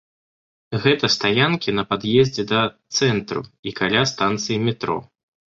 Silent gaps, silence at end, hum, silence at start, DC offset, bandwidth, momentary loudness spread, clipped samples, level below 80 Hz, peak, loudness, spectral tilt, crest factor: 3.59-3.63 s; 0.55 s; none; 0.7 s; under 0.1%; 7.8 kHz; 10 LU; under 0.1%; -54 dBFS; -2 dBFS; -20 LUFS; -4.5 dB/octave; 20 dB